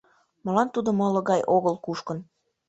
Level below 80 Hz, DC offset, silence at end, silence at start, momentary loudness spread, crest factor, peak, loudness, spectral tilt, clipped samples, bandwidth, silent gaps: -66 dBFS; under 0.1%; 0.45 s; 0.45 s; 13 LU; 18 dB; -8 dBFS; -25 LUFS; -7 dB/octave; under 0.1%; 8.2 kHz; none